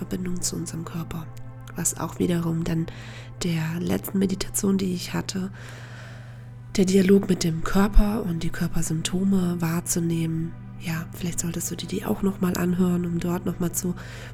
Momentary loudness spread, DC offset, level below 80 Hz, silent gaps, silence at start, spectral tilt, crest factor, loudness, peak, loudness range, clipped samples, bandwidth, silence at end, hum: 14 LU; under 0.1%; -34 dBFS; none; 0 s; -5.5 dB/octave; 22 dB; -25 LUFS; -2 dBFS; 5 LU; under 0.1%; 17 kHz; 0 s; none